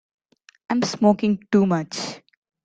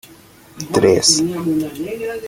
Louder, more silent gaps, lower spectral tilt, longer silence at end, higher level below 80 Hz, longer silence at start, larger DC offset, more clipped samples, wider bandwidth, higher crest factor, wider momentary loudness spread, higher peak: second, -21 LUFS vs -16 LUFS; neither; first, -6 dB/octave vs -3.5 dB/octave; first, 0.45 s vs 0 s; second, -64 dBFS vs -50 dBFS; first, 0.7 s vs 0.55 s; neither; neither; second, 9 kHz vs 17 kHz; about the same, 20 dB vs 18 dB; about the same, 12 LU vs 13 LU; second, -4 dBFS vs 0 dBFS